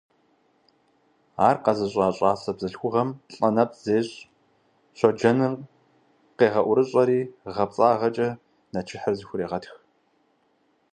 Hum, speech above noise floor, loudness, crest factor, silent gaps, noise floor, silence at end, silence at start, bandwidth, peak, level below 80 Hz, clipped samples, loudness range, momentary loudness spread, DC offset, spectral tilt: none; 44 dB; -24 LUFS; 22 dB; none; -67 dBFS; 1.2 s; 1.4 s; 9.6 kHz; -4 dBFS; -62 dBFS; under 0.1%; 3 LU; 13 LU; under 0.1%; -7 dB/octave